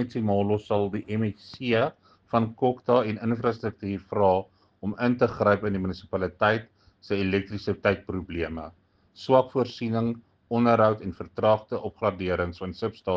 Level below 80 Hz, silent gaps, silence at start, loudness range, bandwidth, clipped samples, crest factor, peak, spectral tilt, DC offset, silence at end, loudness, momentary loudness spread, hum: -56 dBFS; none; 0 s; 3 LU; 7.2 kHz; under 0.1%; 20 dB; -6 dBFS; -8 dB/octave; under 0.1%; 0 s; -26 LUFS; 10 LU; none